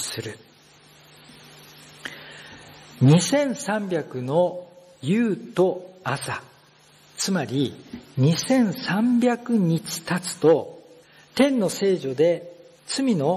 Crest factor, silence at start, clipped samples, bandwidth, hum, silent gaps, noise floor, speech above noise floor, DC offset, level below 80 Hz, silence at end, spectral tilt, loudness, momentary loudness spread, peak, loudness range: 16 dB; 0 s; under 0.1%; 13 kHz; none; none; -54 dBFS; 32 dB; under 0.1%; -68 dBFS; 0 s; -5.5 dB/octave; -23 LUFS; 19 LU; -6 dBFS; 4 LU